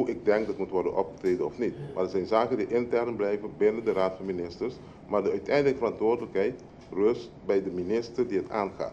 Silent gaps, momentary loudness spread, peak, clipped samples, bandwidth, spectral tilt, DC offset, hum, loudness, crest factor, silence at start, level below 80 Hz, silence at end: none; 7 LU; -10 dBFS; under 0.1%; 8 kHz; -7 dB/octave; under 0.1%; none; -29 LUFS; 18 dB; 0 s; -58 dBFS; 0 s